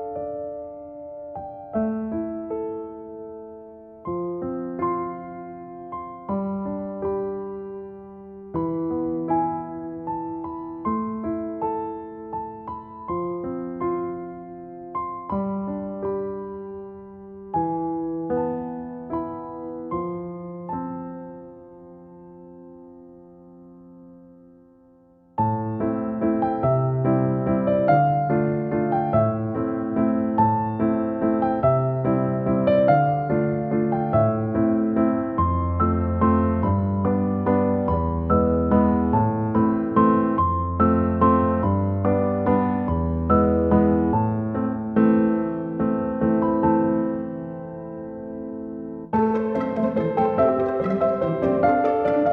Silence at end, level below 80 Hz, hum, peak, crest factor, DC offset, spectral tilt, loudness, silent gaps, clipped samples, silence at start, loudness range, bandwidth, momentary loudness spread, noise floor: 0 s; -42 dBFS; none; -4 dBFS; 20 dB; under 0.1%; -12 dB/octave; -23 LUFS; none; under 0.1%; 0 s; 11 LU; 4.5 kHz; 16 LU; -54 dBFS